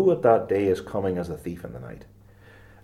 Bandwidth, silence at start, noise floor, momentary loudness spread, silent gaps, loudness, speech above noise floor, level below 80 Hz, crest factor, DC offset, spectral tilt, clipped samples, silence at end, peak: 14 kHz; 0 s; -50 dBFS; 20 LU; none; -24 LUFS; 26 dB; -54 dBFS; 20 dB; under 0.1%; -8 dB/octave; under 0.1%; 0.8 s; -6 dBFS